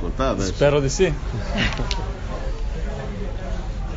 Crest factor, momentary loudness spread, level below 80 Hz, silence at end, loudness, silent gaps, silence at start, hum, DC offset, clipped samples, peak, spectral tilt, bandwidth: 18 dB; 12 LU; -26 dBFS; 0 s; -24 LUFS; none; 0 s; none; under 0.1%; under 0.1%; -4 dBFS; -5 dB/octave; 7.8 kHz